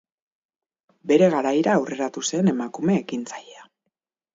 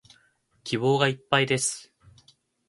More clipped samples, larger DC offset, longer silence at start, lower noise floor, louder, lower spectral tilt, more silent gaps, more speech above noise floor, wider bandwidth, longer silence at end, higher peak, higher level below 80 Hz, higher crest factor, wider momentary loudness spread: neither; neither; first, 1.05 s vs 0.65 s; first, -80 dBFS vs -65 dBFS; about the same, -22 LUFS vs -24 LUFS; first, -5.5 dB/octave vs -3.5 dB/octave; neither; first, 59 dB vs 41 dB; second, 7.8 kHz vs 11.5 kHz; second, 0.7 s vs 0.85 s; about the same, -6 dBFS vs -4 dBFS; about the same, -70 dBFS vs -66 dBFS; second, 18 dB vs 24 dB; about the same, 15 LU vs 14 LU